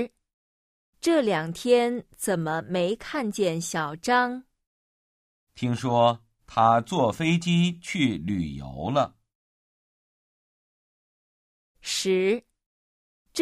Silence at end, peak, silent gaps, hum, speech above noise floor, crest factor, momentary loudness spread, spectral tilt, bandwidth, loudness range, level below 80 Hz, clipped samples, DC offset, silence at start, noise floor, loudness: 0 s; -6 dBFS; 0.33-0.93 s, 4.67-5.47 s, 9.35-11.75 s, 12.66-13.25 s; none; over 66 dB; 20 dB; 9 LU; -5 dB/octave; 15.5 kHz; 9 LU; -58 dBFS; under 0.1%; under 0.1%; 0 s; under -90 dBFS; -25 LUFS